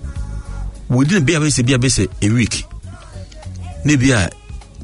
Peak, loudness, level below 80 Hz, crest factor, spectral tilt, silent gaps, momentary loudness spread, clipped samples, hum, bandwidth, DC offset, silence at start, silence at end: -2 dBFS; -15 LUFS; -32 dBFS; 16 dB; -5 dB/octave; none; 21 LU; under 0.1%; none; 11 kHz; under 0.1%; 0 s; 0 s